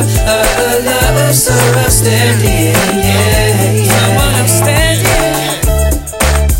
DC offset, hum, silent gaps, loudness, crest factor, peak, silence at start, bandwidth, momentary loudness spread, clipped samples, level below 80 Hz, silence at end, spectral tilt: under 0.1%; none; none; -10 LUFS; 10 dB; 0 dBFS; 0 s; 17 kHz; 4 LU; under 0.1%; -18 dBFS; 0 s; -4 dB/octave